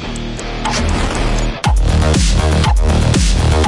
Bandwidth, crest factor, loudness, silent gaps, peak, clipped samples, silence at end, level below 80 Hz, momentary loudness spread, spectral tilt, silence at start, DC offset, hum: 11.5 kHz; 12 dB; -15 LUFS; none; 0 dBFS; under 0.1%; 0 s; -16 dBFS; 7 LU; -5 dB/octave; 0 s; under 0.1%; none